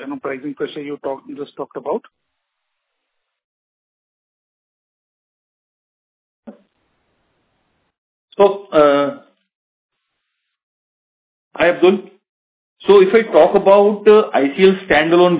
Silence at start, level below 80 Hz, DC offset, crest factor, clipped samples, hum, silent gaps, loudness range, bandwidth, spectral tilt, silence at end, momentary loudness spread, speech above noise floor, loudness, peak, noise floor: 0 s; -56 dBFS; under 0.1%; 18 dB; under 0.1%; none; 3.44-6.43 s, 7.98-8.28 s, 9.55-9.89 s, 10.63-11.51 s, 12.29-12.76 s; 18 LU; 4 kHz; -9.5 dB/octave; 0 s; 16 LU; 61 dB; -14 LUFS; 0 dBFS; -75 dBFS